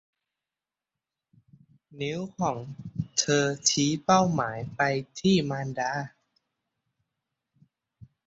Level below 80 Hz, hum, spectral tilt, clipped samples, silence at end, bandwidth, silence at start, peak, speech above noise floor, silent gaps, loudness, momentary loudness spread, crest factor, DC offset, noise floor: -62 dBFS; none; -4 dB/octave; under 0.1%; 2.2 s; 8.2 kHz; 1.9 s; -8 dBFS; over 63 dB; none; -27 LUFS; 13 LU; 22 dB; under 0.1%; under -90 dBFS